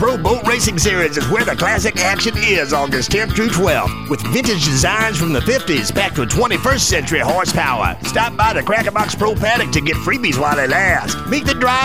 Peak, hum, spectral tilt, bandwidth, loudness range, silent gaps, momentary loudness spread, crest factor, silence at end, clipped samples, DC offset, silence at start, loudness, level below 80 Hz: 0 dBFS; none; -3.5 dB/octave; 16.5 kHz; 1 LU; none; 4 LU; 14 dB; 0 s; under 0.1%; 2%; 0 s; -15 LUFS; -30 dBFS